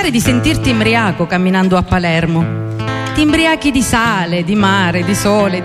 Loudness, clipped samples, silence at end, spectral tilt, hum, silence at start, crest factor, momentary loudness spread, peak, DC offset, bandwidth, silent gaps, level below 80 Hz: -13 LUFS; under 0.1%; 0 s; -5 dB/octave; none; 0 s; 12 dB; 5 LU; -2 dBFS; under 0.1%; 15 kHz; none; -32 dBFS